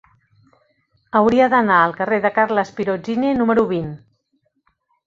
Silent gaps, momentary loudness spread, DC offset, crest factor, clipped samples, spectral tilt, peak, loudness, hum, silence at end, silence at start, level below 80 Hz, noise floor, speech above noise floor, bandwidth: none; 9 LU; under 0.1%; 18 dB; under 0.1%; -7 dB/octave; -2 dBFS; -17 LUFS; none; 1.1 s; 1.15 s; -54 dBFS; -68 dBFS; 51 dB; 7.4 kHz